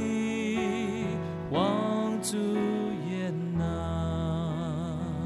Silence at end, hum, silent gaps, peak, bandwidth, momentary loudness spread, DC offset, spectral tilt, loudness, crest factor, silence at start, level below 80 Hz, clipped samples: 0 s; none; none; -14 dBFS; 13.5 kHz; 5 LU; under 0.1%; -6 dB/octave; -30 LUFS; 14 dB; 0 s; -52 dBFS; under 0.1%